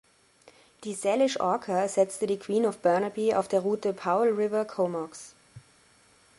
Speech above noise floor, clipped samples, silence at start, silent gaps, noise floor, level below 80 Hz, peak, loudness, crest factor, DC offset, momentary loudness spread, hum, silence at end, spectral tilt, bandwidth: 34 dB; under 0.1%; 0.8 s; none; -60 dBFS; -72 dBFS; -10 dBFS; -27 LUFS; 18 dB; under 0.1%; 11 LU; none; 0.8 s; -5 dB/octave; 11.5 kHz